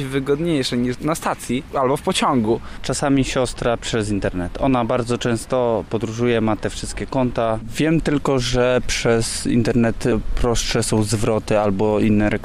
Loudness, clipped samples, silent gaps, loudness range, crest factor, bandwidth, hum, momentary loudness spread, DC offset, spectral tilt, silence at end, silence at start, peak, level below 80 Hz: -20 LUFS; under 0.1%; none; 2 LU; 12 dB; 15.5 kHz; none; 5 LU; under 0.1%; -5 dB/octave; 0 s; 0 s; -6 dBFS; -32 dBFS